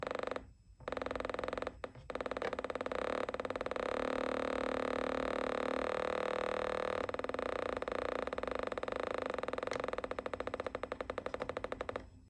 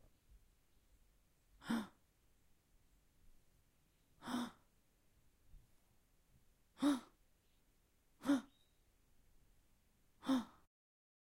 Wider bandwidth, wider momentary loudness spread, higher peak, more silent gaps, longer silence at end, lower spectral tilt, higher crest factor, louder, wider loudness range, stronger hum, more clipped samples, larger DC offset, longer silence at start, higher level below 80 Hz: second, 10.5 kHz vs 16 kHz; second, 6 LU vs 17 LU; about the same, -24 dBFS vs -26 dBFS; neither; second, 0 s vs 0.8 s; about the same, -5 dB/octave vs -4.5 dB/octave; second, 16 dB vs 22 dB; first, -39 LUFS vs -42 LUFS; second, 4 LU vs 9 LU; neither; neither; neither; second, 0 s vs 1.65 s; first, -58 dBFS vs -74 dBFS